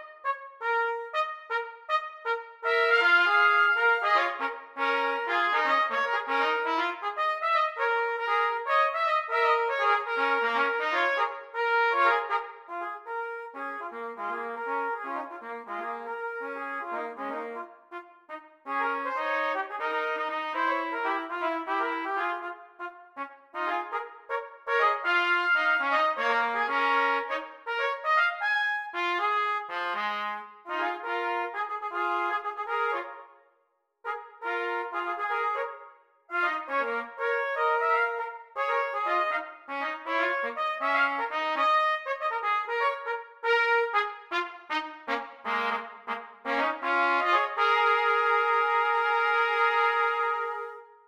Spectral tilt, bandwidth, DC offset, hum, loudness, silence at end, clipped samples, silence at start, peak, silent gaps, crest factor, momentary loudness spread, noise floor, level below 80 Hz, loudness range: -2 dB/octave; 15 kHz; under 0.1%; none; -27 LUFS; 0.25 s; under 0.1%; 0 s; -10 dBFS; none; 18 dB; 12 LU; -73 dBFS; -86 dBFS; 9 LU